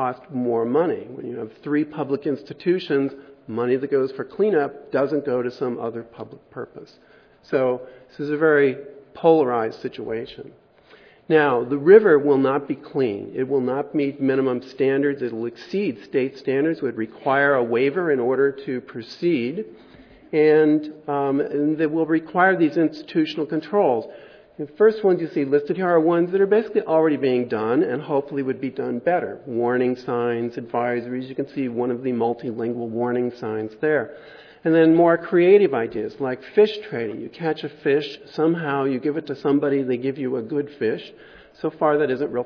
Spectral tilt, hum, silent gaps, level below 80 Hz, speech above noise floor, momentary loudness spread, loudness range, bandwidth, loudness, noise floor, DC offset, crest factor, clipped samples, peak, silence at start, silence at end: -8.5 dB/octave; none; none; -68 dBFS; 30 dB; 13 LU; 6 LU; 5.4 kHz; -22 LUFS; -51 dBFS; under 0.1%; 20 dB; under 0.1%; 0 dBFS; 0 s; 0 s